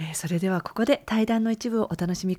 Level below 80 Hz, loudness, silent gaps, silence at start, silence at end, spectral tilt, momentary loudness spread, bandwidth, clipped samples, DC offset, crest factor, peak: -56 dBFS; -25 LUFS; none; 0 s; 0 s; -5.5 dB/octave; 4 LU; 15.5 kHz; under 0.1%; under 0.1%; 18 dB; -8 dBFS